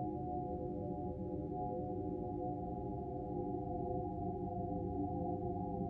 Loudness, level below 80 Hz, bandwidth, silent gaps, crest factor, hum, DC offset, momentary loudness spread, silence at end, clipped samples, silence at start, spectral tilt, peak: -42 LUFS; -54 dBFS; 3.1 kHz; none; 12 dB; none; under 0.1%; 3 LU; 0 s; under 0.1%; 0 s; -13 dB/octave; -28 dBFS